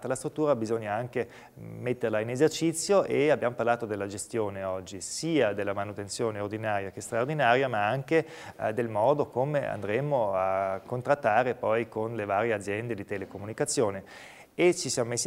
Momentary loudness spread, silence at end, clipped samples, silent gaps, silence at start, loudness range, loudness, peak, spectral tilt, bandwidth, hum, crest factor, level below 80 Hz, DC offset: 10 LU; 0 s; under 0.1%; none; 0 s; 3 LU; -29 LUFS; -8 dBFS; -4.5 dB/octave; 16 kHz; none; 20 dB; -66 dBFS; under 0.1%